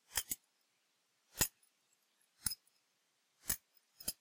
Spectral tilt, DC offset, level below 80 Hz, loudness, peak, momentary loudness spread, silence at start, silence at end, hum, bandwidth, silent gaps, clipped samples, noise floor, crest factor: -0.5 dB/octave; under 0.1%; -64 dBFS; -41 LUFS; -14 dBFS; 12 LU; 0.1 s; 0.05 s; none; 16.5 kHz; none; under 0.1%; -80 dBFS; 32 dB